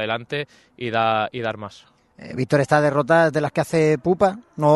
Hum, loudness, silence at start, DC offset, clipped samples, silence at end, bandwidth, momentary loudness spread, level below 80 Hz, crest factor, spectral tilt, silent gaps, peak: none; -20 LUFS; 0 s; under 0.1%; under 0.1%; 0 s; 12 kHz; 15 LU; -58 dBFS; 18 dB; -6.5 dB/octave; none; -2 dBFS